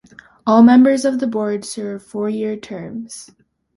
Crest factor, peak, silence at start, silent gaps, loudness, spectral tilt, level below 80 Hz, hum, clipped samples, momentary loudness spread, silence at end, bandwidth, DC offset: 16 dB; -2 dBFS; 0.45 s; none; -16 LUFS; -5.5 dB/octave; -60 dBFS; none; under 0.1%; 20 LU; 0.5 s; 11.5 kHz; under 0.1%